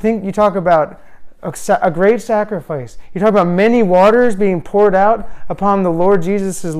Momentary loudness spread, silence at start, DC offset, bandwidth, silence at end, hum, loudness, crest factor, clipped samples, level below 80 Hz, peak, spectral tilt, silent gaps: 14 LU; 0 s; under 0.1%; 14 kHz; 0 s; none; -13 LUFS; 10 dB; under 0.1%; -40 dBFS; -2 dBFS; -6.5 dB/octave; none